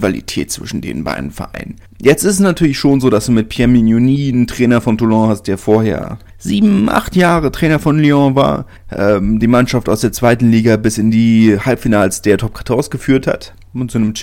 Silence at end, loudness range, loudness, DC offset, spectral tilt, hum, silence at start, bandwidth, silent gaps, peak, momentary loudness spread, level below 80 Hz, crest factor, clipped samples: 0 s; 2 LU; -13 LUFS; under 0.1%; -6 dB/octave; none; 0 s; 16.5 kHz; none; 0 dBFS; 12 LU; -34 dBFS; 12 dB; under 0.1%